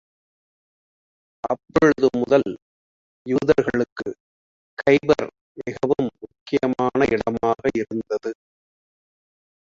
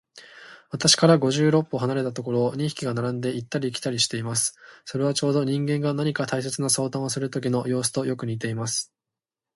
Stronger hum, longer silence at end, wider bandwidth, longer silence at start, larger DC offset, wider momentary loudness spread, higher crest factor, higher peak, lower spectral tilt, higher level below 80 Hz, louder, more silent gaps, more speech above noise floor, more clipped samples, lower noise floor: neither; first, 1.3 s vs 0.7 s; second, 7.6 kHz vs 12 kHz; first, 1.45 s vs 0.15 s; neither; first, 16 LU vs 9 LU; about the same, 20 dB vs 20 dB; about the same, -2 dBFS vs -4 dBFS; first, -6.5 dB/octave vs -4.5 dB/octave; first, -54 dBFS vs -64 dBFS; first, -21 LUFS vs -24 LUFS; first, 2.62-3.25 s, 3.92-3.96 s, 4.20-4.77 s, 5.41-5.55 s, 6.41-6.46 s vs none; first, over 70 dB vs 65 dB; neither; about the same, under -90 dBFS vs -89 dBFS